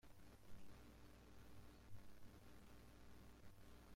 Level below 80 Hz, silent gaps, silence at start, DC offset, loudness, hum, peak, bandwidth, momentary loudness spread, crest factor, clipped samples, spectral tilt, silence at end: -70 dBFS; none; 0.05 s; under 0.1%; -66 LUFS; none; -44 dBFS; 16.5 kHz; 1 LU; 14 dB; under 0.1%; -5 dB/octave; 0 s